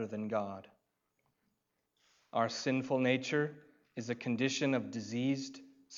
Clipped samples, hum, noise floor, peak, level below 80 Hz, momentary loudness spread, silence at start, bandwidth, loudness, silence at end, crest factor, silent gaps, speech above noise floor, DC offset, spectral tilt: under 0.1%; none; -82 dBFS; -18 dBFS; -86 dBFS; 14 LU; 0 s; 7.6 kHz; -35 LUFS; 0 s; 18 dB; none; 47 dB; under 0.1%; -5 dB/octave